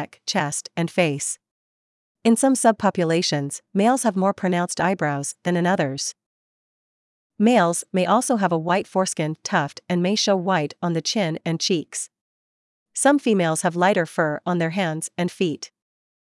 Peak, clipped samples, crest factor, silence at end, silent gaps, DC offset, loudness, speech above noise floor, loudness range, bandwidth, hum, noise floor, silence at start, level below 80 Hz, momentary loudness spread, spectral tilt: -4 dBFS; under 0.1%; 18 dB; 0.6 s; 1.51-2.15 s, 6.26-7.30 s, 12.21-12.86 s; under 0.1%; -22 LUFS; over 69 dB; 2 LU; 12 kHz; none; under -90 dBFS; 0 s; -72 dBFS; 8 LU; -4.5 dB/octave